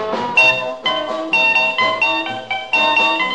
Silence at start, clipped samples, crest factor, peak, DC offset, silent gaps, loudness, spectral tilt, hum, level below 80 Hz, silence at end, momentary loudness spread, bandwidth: 0 s; under 0.1%; 14 dB; -2 dBFS; 0.4%; none; -15 LUFS; -2.5 dB/octave; none; -60 dBFS; 0 s; 9 LU; 9.6 kHz